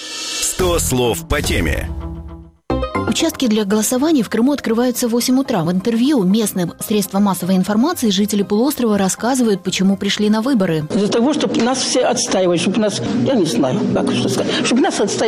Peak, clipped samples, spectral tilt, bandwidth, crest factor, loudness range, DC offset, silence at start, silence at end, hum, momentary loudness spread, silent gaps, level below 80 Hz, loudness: -6 dBFS; under 0.1%; -4.5 dB/octave; 16 kHz; 10 dB; 2 LU; under 0.1%; 0 s; 0 s; none; 4 LU; none; -34 dBFS; -16 LUFS